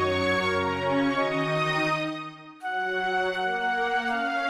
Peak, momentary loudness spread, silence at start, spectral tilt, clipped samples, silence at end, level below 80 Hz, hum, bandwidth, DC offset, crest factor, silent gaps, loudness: -14 dBFS; 8 LU; 0 s; -5 dB/octave; under 0.1%; 0 s; -60 dBFS; none; 13 kHz; under 0.1%; 12 dB; none; -26 LUFS